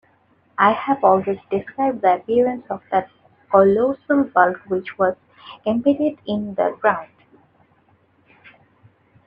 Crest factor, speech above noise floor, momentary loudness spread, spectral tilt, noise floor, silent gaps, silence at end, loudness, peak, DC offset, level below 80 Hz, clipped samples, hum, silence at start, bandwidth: 20 dB; 40 dB; 10 LU; -8.5 dB/octave; -59 dBFS; none; 2.2 s; -19 LUFS; -2 dBFS; under 0.1%; -64 dBFS; under 0.1%; none; 0.6 s; 5.2 kHz